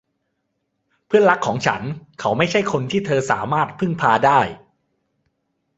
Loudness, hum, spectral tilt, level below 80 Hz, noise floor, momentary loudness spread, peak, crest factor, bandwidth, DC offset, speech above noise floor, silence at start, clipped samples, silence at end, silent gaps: -19 LUFS; none; -5.5 dB/octave; -56 dBFS; -73 dBFS; 9 LU; 0 dBFS; 20 dB; 8.2 kHz; under 0.1%; 55 dB; 1.1 s; under 0.1%; 1.2 s; none